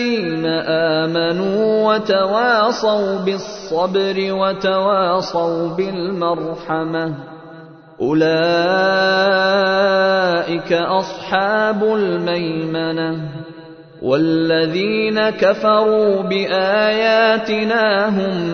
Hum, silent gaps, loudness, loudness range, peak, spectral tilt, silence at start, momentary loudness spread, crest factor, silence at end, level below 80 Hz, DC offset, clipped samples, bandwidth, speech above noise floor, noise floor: none; none; -17 LUFS; 4 LU; -2 dBFS; -6 dB/octave; 0 s; 8 LU; 14 dB; 0 s; -56 dBFS; under 0.1%; under 0.1%; 6.6 kHz; 23 dB; -39 dBFS